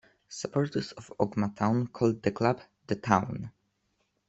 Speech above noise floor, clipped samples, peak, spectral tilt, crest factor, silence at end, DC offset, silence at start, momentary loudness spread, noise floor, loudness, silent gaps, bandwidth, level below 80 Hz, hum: 47 dB; under 0.1%; -6 dBFS; -6.5 dB/octave; 26 dB; 0.8 s; under 0.1%; 0.3 s; 13 LU; -76 dBFS; -30 LUFS; none; 8.2 kHz; -64 dBFS; none